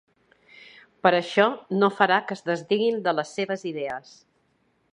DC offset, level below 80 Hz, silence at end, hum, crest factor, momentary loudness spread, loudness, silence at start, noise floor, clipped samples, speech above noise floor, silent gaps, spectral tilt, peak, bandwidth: under 0.1%; -74 dBFS; 0.95 s; none; 24 dB; 10 LU; -24 LUFS; 1.05 s; -68 dBFS; under 0.1%; 44 dB; none; -5 dB/octave; -2 dBFS; 10.5 kHz